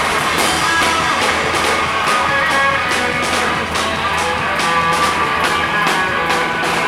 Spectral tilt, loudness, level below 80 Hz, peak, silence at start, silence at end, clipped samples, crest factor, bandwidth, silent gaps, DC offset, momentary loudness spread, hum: -2.5 dB/octave; -15 LUFS; -40 dBFS; -2 dBFS; 0 s; 0 s; under 0.1%; 14 dB; 16.5 kHz; none; under 0.1%; 3 LU; none